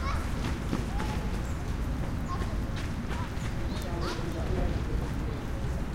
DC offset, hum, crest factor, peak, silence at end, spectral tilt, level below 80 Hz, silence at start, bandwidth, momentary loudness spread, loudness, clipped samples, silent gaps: under 0.1%; none; 16 dB; -14 dBFS; 0 s; -6.5 dB/octave; -34 dBFS; 0 s; 16 kHz; 3 LU; -33 LUFS; under 0.1%; none